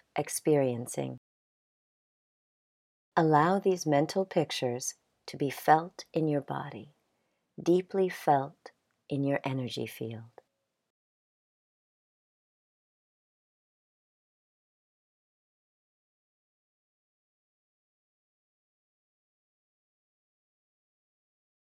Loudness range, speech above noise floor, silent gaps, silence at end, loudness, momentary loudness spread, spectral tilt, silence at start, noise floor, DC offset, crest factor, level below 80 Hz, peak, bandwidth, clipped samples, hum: 9 LU; 50 dB; 1.18-3.12 s; 11.45 s; -30 LUFS; 15 LU; -5.5 dB/octave; 0.15 s; -79 dBFS; under 0.1%; 26 dB; -80 dBFS; -8 dBFS; 16 kHz; under 0.1%; none